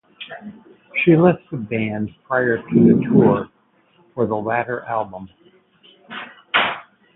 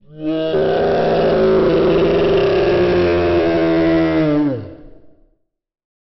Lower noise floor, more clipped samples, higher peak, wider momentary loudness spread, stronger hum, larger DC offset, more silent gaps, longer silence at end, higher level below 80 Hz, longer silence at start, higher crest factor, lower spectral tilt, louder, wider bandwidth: second, -58 dBFS vs -62 dBFS; neither; first, -2 dBFS vs -6 dBFS; first, 21 LU vs 6 LU; neither; neither; neither; second, 0.35 s vs 1.1 s; second, -56 dBFS vs -36 dBFS; about the same, 0.2 s vs 0.1 s; first, 18 dB vs 10 dB; first, -11.5 dB/octave vs -5.5 dB/octave; second, -18 LUFS vs -15 LUFS; second, 4.1 kHz vs 6 kHz